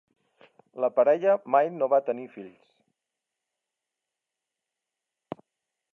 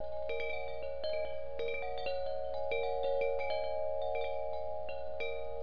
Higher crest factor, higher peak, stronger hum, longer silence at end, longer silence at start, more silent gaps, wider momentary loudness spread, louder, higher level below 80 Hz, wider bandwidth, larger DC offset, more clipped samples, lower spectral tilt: first, 22 dB vs 14 dB; first, -8 dBFS vs -22 dBFS; second, none vs 60 Hz at -55 dBFS; first, 3.45 s vs 0 s; first, 0.75 s vs 0 s; neither; first, 21 LU vs 6 LU; first, -24 LUFS vs -38 LUFS; second, -88 dBFS vs -54 dBFS; second, 3.8 kHz vs 5.4 kHz; second, under 0.1% vs 1%; neither; first, -8 dB/octave vs -1.5 dB/octave